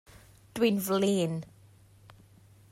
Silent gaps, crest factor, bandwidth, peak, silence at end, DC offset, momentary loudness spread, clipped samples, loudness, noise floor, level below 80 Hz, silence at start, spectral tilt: none; 18 dB; 16 kHz; -14 dBFS; 1.25 s; under 0.1%; 16 LU; under 0.1%; -29 LUFS; -57 dBFS; -66 dBFS; 0.55 s; -5.5 dB/octave